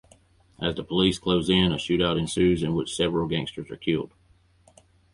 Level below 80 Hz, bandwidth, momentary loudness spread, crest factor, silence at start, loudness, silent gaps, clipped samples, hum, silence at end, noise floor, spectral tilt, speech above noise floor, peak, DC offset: -46 dBFS; 11.5 kHz; 8 LU; 18 dB; 0.6 s; -25 LUFS; none; under 0.1%; none; 1.05 s; -60 dBFS; -5.5 dB/octave; 36 dB; -8 dBFS; under 0.1%